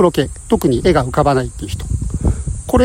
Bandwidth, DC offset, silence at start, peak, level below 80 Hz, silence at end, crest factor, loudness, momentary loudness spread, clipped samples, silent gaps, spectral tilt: 16.5 kHz; under 0.1%; 0 s; -2 dBFS; -26 dBFS; 0 s; 14 dB; -17 LUFS; 9 LU; under 0.1%; none; -6.5 dB/octave